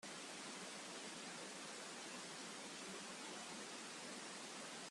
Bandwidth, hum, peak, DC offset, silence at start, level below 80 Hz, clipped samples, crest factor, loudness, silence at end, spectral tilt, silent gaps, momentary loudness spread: 13 kHz; none; -38 dBFS; under 0.1%; 0 s; under -90 dBFS; under 0.1%; 14 dB; -50 LUFS; 0 s; -1.5 dB/octave; none; 0 LU